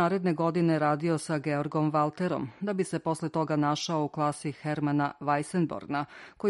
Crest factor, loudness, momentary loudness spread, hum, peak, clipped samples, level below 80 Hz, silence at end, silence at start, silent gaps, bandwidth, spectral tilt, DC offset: 16 dB; -29 LUFS; 6 LU; none; -14 dBFS; under 0.1%; -68 dBFS; 0 s; 0 s; none; 11.5 kHz; -6.5 dB/octave; under 0.1%